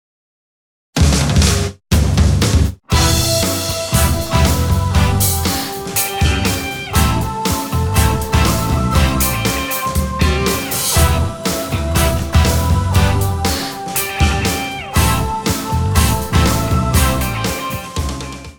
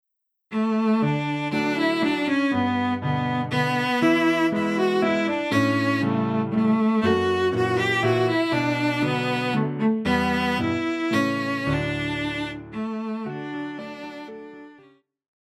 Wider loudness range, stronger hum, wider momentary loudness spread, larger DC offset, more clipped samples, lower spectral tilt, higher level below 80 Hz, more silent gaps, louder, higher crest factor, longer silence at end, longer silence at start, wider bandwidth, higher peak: second, 2 LU vs 6 LU; neither; second, 6 LU vs 11 LU; neither; neither; second, -4.5 dB/octave vs -6.5 dB/octave; first, -22 dBFS vs -52 dBFS; neither; first, -16 LUFS vs -23 LUFS; about the same, 16 dB vs 16 dB; second, 0.05 s vs 0.8 s; first, 0.95 s vs 0.5 s; first, over 20 kHz vs 14.5 kHz; first, 0 dBFS vs -8 dBFS